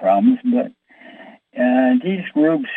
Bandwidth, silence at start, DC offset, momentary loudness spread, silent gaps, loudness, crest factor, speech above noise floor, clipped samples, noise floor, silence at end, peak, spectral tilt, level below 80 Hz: 3.9 kHz; 0 s; under 0.1%; 8 LU; none; -17 LUFS; 14 dB; 26 dB; under 0.1%; -43 dBFS; 0 s; -4 dBFS; -9.5 dB/octave; -70 dBFS